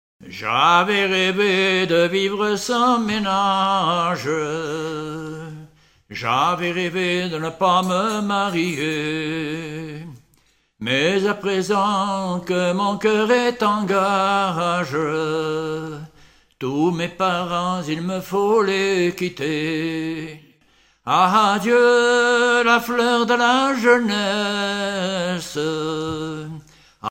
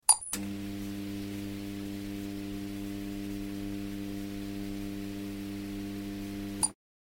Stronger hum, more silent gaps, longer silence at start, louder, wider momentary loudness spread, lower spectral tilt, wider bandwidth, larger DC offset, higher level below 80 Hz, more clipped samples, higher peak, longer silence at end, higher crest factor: neither; neither; about the same, 0.2 s vs 0.1 s; first, -19 LUFS vs -36 LUFS; first, 13 LU vs 7 LU; about the same, -4.5 dB/octave vs -3.5 dB/octave; about the same, 16 kHz vs 17 kHz; neither; second, -58 dBFS vs -52 dBFS; neither; about the same, -2 dBFS vs -4 dBFS; second, 0 s vs 0.35 s; second, 18 dB vs 30 dB